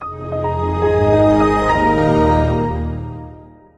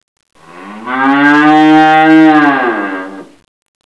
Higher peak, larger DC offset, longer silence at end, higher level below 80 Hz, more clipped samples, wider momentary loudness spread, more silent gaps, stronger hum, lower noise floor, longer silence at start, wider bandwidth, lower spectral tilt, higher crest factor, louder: about the same, -2 dBFS vs 0 dBFS; neither; second, 0.3 s vs 0.75 s; first, -30 dBFS vs -60 dBFS; second, under 0.1% vs 1%; second, 12 LU vs 16 LU; neither; neither; first, -39 dBFS vs -30 dBFS; second, 0 s vs 0.55 s; first, 10.5 kHz vs 8 kHz; first, -8 dB/octave vs -6 dB/octave; about the same, 14 dB vs 10 dB; second, -16 LUFS vs -7 LUFS